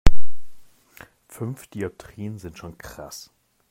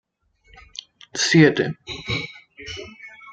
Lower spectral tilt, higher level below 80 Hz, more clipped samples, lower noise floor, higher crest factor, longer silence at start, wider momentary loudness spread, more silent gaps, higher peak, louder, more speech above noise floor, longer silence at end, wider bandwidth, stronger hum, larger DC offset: about the same, -5.5 dB/octave vs -4.5 dB/octave; first, -30 dBFS vs -54 dBFS; first, 0.3% vs under 0.1%; second, -49 dBFS vs -60 dBFS; about the same, 18 dB vs 22 dB; second, 0.05 s vs 1.15 s; second, 15 LU vs 24 LU; neither; about the same, 0 dBFS vs -2 dBFS; second, -34 LUFS vs -20 LUFS; second, 21 dB vs 40 dB; about the same, 0 s vs 0 s; first, 14.5 kHz vs 9.2 kHz; neither; neither